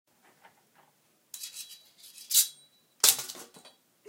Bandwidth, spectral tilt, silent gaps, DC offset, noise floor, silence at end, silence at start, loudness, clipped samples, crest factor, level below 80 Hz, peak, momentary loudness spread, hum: 17 kHz; 2.5 dB/octave; none; under 0.1%; -68 dBFS; 0.65 s; 1.35 s; -24 LUFS; under 0.1%; 32 dB; -82 dBFS; -2 dBFS; 24 LU; none